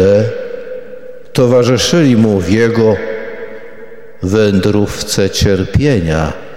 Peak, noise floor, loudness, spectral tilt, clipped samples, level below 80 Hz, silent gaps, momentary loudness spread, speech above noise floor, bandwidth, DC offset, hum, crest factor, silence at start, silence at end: 0 dBFS; -34 dBFS; -12 LUFS; -5.5 dB/octave; under 0.1%; -32 dBFS; none; 18 LU; 24 dB; 16.5 kHz; 3%; none; 12 dB; 0 s; 0 s